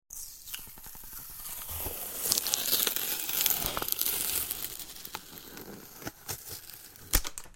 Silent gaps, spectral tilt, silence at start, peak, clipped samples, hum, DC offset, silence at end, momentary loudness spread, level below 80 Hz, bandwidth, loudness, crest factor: none; -0.5 dB/octave; 0.1 s; -2 dBFS; under 0.1%; none; under 0.1%; 0 s; 18 LU; -46 dBFS; 17 kHz; -30 LUFS; 32 dB